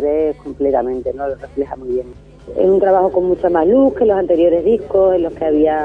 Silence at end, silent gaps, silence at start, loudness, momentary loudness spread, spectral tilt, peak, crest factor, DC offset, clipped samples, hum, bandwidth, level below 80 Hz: 0 s; none; 0 s; -15 LUFS; 11 LU; -9 dB/octave; -4 dBFS; 12 dB; under 0.1%; under 0.1%; none; 4.6 kHz; -42 dBFS